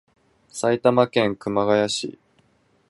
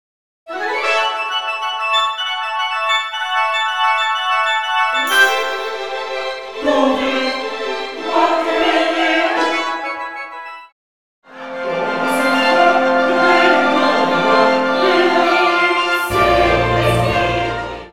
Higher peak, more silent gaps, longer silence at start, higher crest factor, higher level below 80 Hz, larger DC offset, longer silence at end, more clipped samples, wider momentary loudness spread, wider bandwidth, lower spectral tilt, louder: second, -4 dBFS vs 0 dBFS; second, none vs 10.72-11.22 s; about the same, 0.55 s vs 0.45 s; about the same, 20 dB vs 16 dB; second, -62 dBFS vs -40 dBFS; neither; first, 0.75 s vs 0.05 s; neither; about the same, 11 LU vs 11 LU; second, 11.5 kHz vs 18 kHz; about the same, -4.5 dB/octave vs -4 dB/octave; second, -21 LUFS vs -15 LUFS